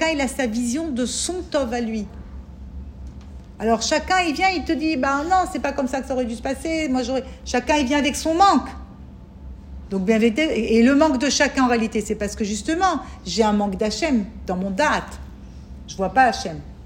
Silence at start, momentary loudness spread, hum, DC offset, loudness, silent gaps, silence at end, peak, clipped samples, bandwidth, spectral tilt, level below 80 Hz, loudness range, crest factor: 0 s; 21 LU; none; under 0.1%; -21 LUFS; none; 0 s; -2 dBFS; under 0.1%; 16 kHz; -4 dB/octave; -40 dBFS; 5 LU; 18 dB